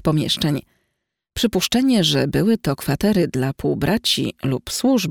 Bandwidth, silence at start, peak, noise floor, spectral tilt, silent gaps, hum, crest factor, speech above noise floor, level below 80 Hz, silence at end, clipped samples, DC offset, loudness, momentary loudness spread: 19 kHz; 0.05 s; -4 dBFS; -77 dBFS; -5 dB/octave; none; none; 14 dB; 58 dB; -44 dBFS; 0 s; under 0.1%; under 0.1%; -19 LUFS; 6 LU